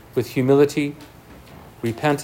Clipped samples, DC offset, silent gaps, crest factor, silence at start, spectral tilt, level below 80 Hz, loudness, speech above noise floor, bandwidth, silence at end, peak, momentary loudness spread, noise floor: under 0.1%; under 0.1%; none; 18 dB; 0.15 s; -6.5 dB/octave; -54 dBFS; -20 LUFS; 24 dB; 16.5 kHz; 0 s; -4 dBFS; 13 LU; -43 dBFS